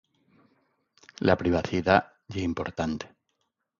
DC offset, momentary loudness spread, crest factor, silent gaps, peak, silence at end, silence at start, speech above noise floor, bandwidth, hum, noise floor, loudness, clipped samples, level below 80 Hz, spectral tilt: under 0.1%; 13 LU; 24 dB; none; -4 dBFS; 0.75 s; 1.2 s; 52 dB; 7.4 kHz; none; -78 dBFS; -27 LUFS; under 0.1%; -48 dBFS; -6.5 dB/octave